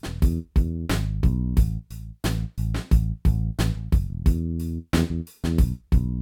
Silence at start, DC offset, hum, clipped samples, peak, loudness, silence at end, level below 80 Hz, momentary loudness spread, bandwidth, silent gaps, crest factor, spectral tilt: 0.05 s; under 0.1%; none; under 0.1%; -6 dBFS; -25 LUFS; 0 s; -24 dBFS; 6 LU; 16.5 kHz; none; 16 dB; -7 dB/octave